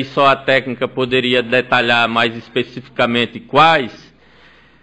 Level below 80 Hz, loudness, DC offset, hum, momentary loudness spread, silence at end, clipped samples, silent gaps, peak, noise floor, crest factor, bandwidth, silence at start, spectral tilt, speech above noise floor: -54 dBFS; -15 LUFS; 0.4%; none; 10 LU; 0.85 s; under 0.1%; none; -2 dBFS; -47 dBFS; 16 dB; 9 kHz; 0 s; -5.5 dB/octave; 32 dB